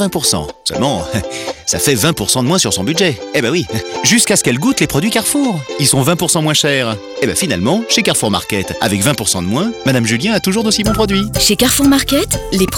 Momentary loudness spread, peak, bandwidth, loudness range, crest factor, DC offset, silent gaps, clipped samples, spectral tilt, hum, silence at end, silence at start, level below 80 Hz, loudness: 7 LU; 0 dBFS; over 20 kHz; 2 LU; 14 dB; under 0.1%; none; under 0.1%; -3.5 dB/octave; none; 0 s; 0 s; -36 dBFS; -13 LUFS